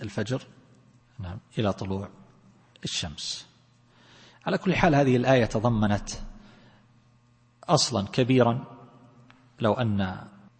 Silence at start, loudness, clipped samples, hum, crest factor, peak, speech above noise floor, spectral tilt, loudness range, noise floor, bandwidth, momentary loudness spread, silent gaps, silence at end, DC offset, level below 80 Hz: 0 s; -26 LUFS; under 0.1%; none; 24 dB; -4 dBFS; 36 dB; -5.5 dB/octave; 8 LU; -61 dBFS; 8.8 kHz; 18 LU; none; 0.3 s; under 0.1%; -48 dBFS